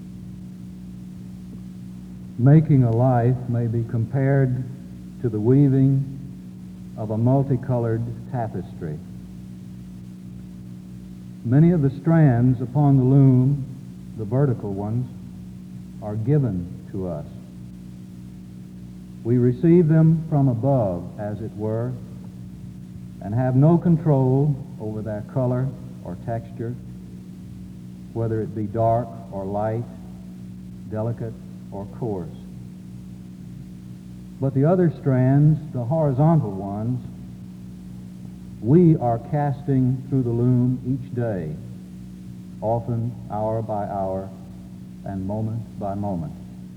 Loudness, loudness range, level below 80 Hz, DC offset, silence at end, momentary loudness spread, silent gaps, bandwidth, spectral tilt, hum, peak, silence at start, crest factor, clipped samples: -22 LUFS; 9 LU; -48 dBFS; under 0.1%; 0 s; 22 LU; none; 4.8 kHz; -11 dB/octave; 60 Hz at -45 dBFS; -4 dBFS; 0 s; 18 dB; under 0.1%